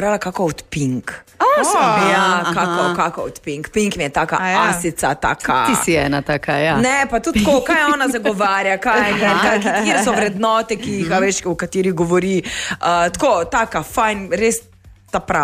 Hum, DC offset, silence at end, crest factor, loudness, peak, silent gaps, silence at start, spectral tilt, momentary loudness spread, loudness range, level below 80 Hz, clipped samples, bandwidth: none; under 0.1%; 0 s; 14 dB; -17 LUFS; -2 dBFS; none; 0 s; -4 dB/octave; 7 LU; 3 LU; -42 dBFS; under 0.1%; 15.5 kHz